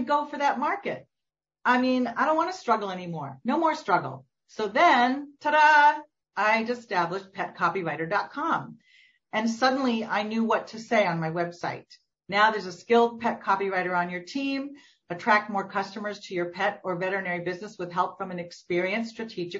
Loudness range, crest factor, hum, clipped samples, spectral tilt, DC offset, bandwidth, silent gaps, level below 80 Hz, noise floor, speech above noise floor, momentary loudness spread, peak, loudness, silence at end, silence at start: 6 LU; 18 dB; none; under 0.1%; -5 dB/octave; under 0.1%; 7.8 kHz; none; -74 dBFS; -88 dBFS; 62 dB; 13 LU; -8 dBFS; -26 LUFS; 0 s; 0 s